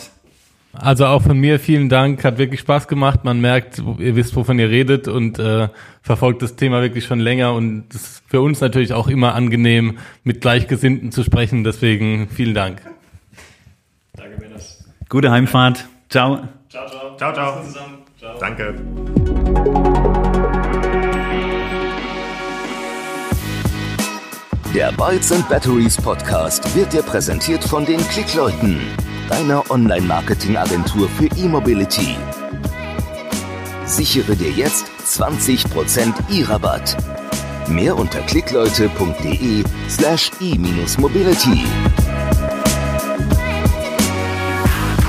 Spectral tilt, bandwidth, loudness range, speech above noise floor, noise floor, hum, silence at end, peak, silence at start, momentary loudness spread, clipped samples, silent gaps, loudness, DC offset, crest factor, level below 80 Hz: -5 dB/octave; 15.5 kHz; 5 LU; 38 dB; -53 dBFS; none; 0 s; 0 dBFS; 0 s; 11 LU; under 0.1%; none; -17 LUFS; under 0.1%; 16 dB; -28 dBFS